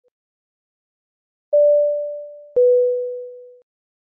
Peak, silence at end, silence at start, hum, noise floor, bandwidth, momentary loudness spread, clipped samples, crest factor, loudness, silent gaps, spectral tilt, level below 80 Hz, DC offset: -10 dBFS; 0.65 s; 1.5 s; none; under -90 dBFS; 1 kHz; 18 LU; under 0.1%; 12 dB; -18 LUFS; none; -8.5 dB/octave; -72 dBFS; under 0.1%